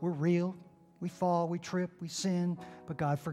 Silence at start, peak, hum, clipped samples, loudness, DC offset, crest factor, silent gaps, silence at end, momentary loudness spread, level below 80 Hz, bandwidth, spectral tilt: 0 s; -20 dBFS; none; under 0.1%; -34 LUFS; under 0.1%; 14 dB; none; 0 s; 12 LU; -72 dBFS; 13 kHz; -6.5 dB/octave